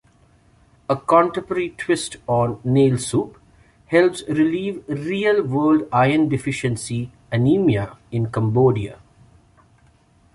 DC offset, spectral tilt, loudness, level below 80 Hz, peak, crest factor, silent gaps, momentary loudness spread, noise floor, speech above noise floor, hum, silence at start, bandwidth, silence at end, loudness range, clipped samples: under 0.1%; -6.5 dB/octave; -20 LUFS; -50 dBFS; -2 dBFS; 18 dB; none; 9 LU; -55 dBFS; 36 dB; none; 0.9 s; 11.5 kHz; 1.4 s; 2 LU; under 0.1%